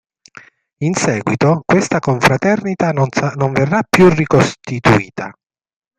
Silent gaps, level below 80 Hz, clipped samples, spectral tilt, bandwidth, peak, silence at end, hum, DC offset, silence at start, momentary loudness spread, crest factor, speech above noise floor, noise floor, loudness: none; -44 dBFS; under 0.1%; -6 dB/octave; 14.5 kHz; 0 dBFS; 0.65 s; none; under 0.1%; 0.8 s; 8 LU; 16 dB; 29 dB; -42 dBFS; -14 LUFS